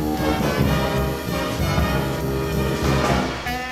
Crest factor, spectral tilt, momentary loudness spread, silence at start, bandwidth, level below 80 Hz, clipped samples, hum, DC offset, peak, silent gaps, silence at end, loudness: 14 dB; -5.5 dB/octave; 4 LU; 0 s; 16 kHz; -30 dBFS; under 0.1%; none; under 0.1%; -8 dBFS; none; 0 s; -22 LUFS